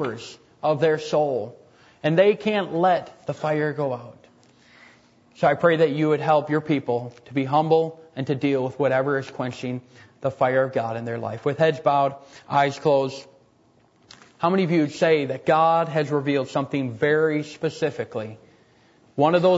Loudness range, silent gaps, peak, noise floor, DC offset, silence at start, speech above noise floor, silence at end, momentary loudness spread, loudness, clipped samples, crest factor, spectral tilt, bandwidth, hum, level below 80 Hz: 3 LU; none; -6 dBFS; -59 dBFS; under 0.1%; 0 s; 37 dB; 0 s; 12 LU; -23 LUFS; under 0.1%; 18 dB; -7 dB/octave; 8 kHz; none; -68 dBFS